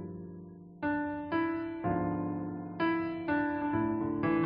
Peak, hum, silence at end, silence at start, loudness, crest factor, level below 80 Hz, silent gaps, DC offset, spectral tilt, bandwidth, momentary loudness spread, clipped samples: -18 dBFS; none; 0 s; 0 s; -33 LUFS; 14 dB; -58 dBFS; none; under 0.1%; -10.5 dB/octave; 5.2 kHz; 12 LU; under 0.1%